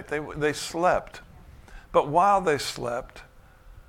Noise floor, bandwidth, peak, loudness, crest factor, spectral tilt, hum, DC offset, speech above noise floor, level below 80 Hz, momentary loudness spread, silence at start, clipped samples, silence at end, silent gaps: -51 dBFS; 16.5 kHz; -8 dBFS; -25 LUFS; 20 dB; -4 dB/octave; none; under 0.1%; 26 dB; -50 dBFS; 18 LU; 0 s; under 0.1%; 0.05 s; none